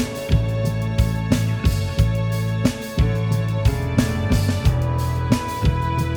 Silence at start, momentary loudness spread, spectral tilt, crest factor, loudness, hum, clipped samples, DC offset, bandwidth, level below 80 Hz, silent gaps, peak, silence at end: 0 s; 2 LU; -6.5 dB/octave; 18 dB; -21 LUFS; none; under 0.1%; under 0.1%; over 20 kHz; -28 dBFS; none; 0 dBFS; 0 s